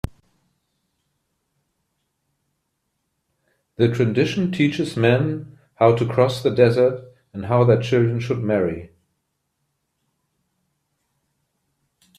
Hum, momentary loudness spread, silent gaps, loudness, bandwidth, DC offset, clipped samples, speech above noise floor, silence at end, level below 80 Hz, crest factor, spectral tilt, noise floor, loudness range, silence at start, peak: none; 14 LU; none; -19 LUFS; 11.5 kHz; under 0.1%; under 0.1%; 56 dB; 3.35 s; -52 dBFS; 22 dB; -7.5 dB/octave; -75 dBFS; 9 LU; 3.8 s; -2 dBFS